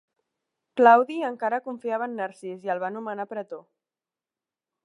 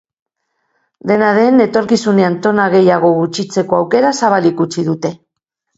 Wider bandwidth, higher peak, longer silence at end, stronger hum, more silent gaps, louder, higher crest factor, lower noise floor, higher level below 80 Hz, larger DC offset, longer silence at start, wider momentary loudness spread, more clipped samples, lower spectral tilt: first, 11 kHz vs 8 kHz; second, -4 dBFS vs 0 dBFS; first, 1.25 s vs 0.6 s; neither; neither; second, -24 LUFS vs -13 LUFS; first, 24 dB vs 14 dB; first, under -90 dBFS vs -75 dBFS; second, -88 dBFS vs -58 dBFS; neither; second, 0.75 s vs 1.05 s; first, 18 LU vs 7 LU; neither; about the same, -6 dB/octave vs -6 dB/octave